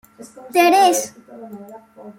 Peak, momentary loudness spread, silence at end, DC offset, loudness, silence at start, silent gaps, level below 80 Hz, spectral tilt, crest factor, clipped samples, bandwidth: -2 dBFS; 25 LU; 0.05 s; under 0.1%; -15 LUFS; 0.2 s; none; -70 dBFS; -2 dB/octave; 16 dB; under 0.1%; 16.5 kHz